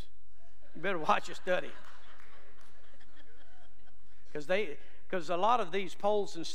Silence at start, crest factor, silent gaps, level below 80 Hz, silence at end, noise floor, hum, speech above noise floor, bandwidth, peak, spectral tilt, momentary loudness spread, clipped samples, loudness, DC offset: 0.75 s; 24 dB; none; -68 dBFS; 0 s; -66 dBFS; none; 33 dB; 15 kHz; -14 dBFS; -4.5 dB/octave; 21 LU; under 0.1%; -33 LUFS; 3%